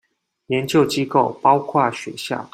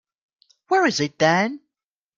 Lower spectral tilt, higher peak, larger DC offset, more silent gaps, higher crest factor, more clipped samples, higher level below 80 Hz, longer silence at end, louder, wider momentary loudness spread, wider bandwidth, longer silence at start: about the same, -5.5 dB/octave vs -4.5 dB/octave; about the same, -2 dBFS vs -4 dBFS; neither; neither; about the same, 18 dB vs 20 dB; neither; first, -62 dBFS vs -68 dBFS; second, 0.05 s vs 0.6 s; about the same, -19 LUFS vs -20 LUFS; about the same, 10 LU vs 8 LU; first, 16 kHz vs 7.6 kHz; second, 0.5 s vs 0.7 s